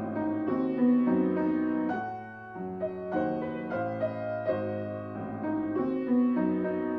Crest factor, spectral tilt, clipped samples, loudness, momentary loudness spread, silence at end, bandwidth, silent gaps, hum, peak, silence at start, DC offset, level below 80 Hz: 14 dB; -10.5 dB/octave; under 0.1%; -30 LUFS; 11 LU; 0 s; 4.8 kHz; none; none; -16 dBFS; 0 s; under 0.1%; -66 dBFS